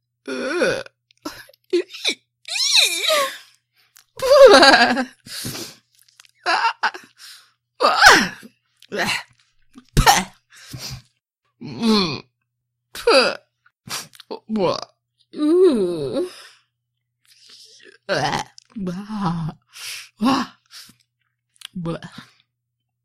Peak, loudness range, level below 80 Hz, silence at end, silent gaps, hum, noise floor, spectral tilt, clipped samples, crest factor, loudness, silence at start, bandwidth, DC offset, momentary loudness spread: 0 dBFS; 13 LU; -40 dBFS; 0.85 s; none; none; -78 dBFS; -3 dB/octave; under 0.1%; 20 dB; -17 LUFS; 0.25 s; 16 kHz; under 0.1%; 24 LU